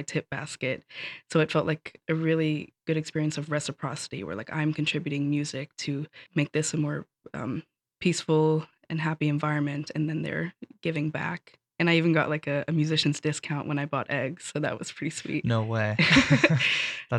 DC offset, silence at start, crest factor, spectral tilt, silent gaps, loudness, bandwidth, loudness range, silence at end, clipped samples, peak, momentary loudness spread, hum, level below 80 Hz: under 0.1%; 0 s; 22 dB; -5 dB/octave; none; -27 LUFS; 11 kHz; 4 LU; 0 s; under 0.1%; -6 dBFS; 12 LU; none; -60 dBFS